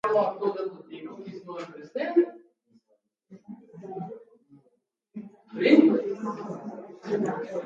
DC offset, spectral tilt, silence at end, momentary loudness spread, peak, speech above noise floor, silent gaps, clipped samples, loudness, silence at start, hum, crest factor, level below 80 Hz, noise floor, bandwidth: under 0.1%; -7 dB/octave; 0 s; 24 LU; -4 dBFS; 48 dB; none; under 0.1%; -26 LUFS; 0.05 s; none; 24 dB; -80 dBFS; -72 dBFS; 7.6 kHz